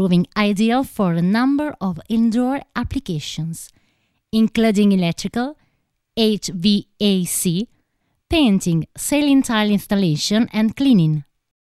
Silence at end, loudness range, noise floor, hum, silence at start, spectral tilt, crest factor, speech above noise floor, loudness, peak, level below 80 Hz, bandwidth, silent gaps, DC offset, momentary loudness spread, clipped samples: 0.45 s; 4 LU; -69 dBFS; none; 0 s; -5.5 dB/octave; 14 dB; 51 dB; -19 LUFS; -4 dBFS; -44 dBFS; 15 kHz; none; under 0.1%; 10 LU; under 0.1%